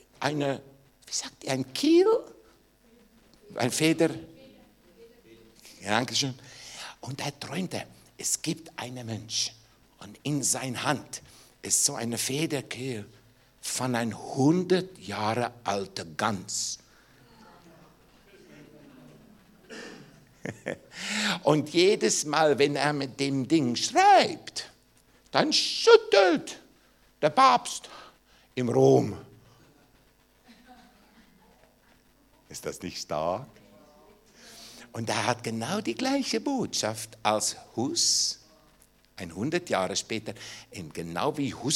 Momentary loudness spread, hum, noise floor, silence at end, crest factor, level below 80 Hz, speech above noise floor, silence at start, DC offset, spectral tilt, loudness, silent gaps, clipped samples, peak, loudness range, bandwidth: 19 LU; none; -62 dBFS; 0 s; 24 dB; -66 dBFS; 36 dB; 0.2 s; under 0.1%; -3.5 dB/octave; -27 LUFS; none; under 0.1%; -4 dBFS; 14 LU; 17 kHz